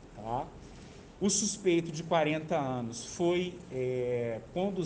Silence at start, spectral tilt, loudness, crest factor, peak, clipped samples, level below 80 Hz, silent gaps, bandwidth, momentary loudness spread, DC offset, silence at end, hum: 0 s; -4.5 dB/octave; -32 LUFS; 16 dB; -16 dBFS; under 0.1%; -58 dBFS; none; 10.5 kHz; 14 LU; under 0.1%; 0 s; none